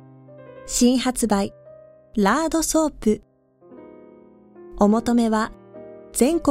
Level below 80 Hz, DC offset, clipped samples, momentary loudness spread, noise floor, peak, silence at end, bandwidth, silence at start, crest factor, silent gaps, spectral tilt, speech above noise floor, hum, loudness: -44 dBFS; under 0.1%; under 0.1%; 12 LU; -50 dBFS; -4 dBFS; 0 s; 16 kHz; 0.4 s; 20 dB; none; -4.5 dB/octave; 31 dB; none; -21 LUFS